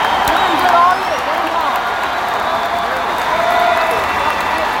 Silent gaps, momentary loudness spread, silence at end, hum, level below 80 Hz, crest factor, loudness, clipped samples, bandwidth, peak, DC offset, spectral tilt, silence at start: none; 6 LU; 0 s; none; -42 dBFS; 14 dB; -15 LUFS; under 0.1%; 17 kHz; 0 dBFS; under 0.1%; -3 dB/octave; 0 s